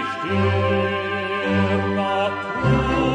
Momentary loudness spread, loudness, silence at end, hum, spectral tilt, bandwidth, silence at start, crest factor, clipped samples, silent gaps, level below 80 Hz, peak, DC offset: 4 LU; -21 LUFS; 0 s; none; -7 dB/octave; 9.8 kHz; 0 s; 14 dB; under 0.1%; none; -38 dBFS; -6 dBFS; under 0.1%